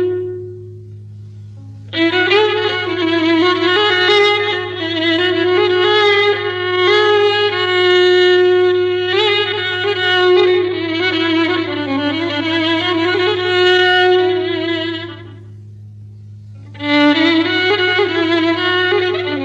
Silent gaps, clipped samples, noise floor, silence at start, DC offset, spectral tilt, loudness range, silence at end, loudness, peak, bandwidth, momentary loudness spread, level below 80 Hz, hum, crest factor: none; under 0.1%; -34 dBFS; 0 s; under 0.1%; -5 dB/octave; 4 LU; 0 s; -13 LUFS; -2 dBFS; 7.8 kHz; 8 LU; -58 dBFS; none; 14 dB